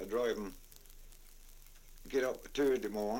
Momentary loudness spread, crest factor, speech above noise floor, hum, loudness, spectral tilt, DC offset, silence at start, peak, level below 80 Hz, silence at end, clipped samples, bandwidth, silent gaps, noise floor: 24 LU; 16 dB; 20 dB; none; -36 LUFS; -4.5 dB/octave; under 0.1%; 0 s; -22 dBFS; -56 dBFS; 0 s; under 0.1%; 17 kHz; none; -55 dBFS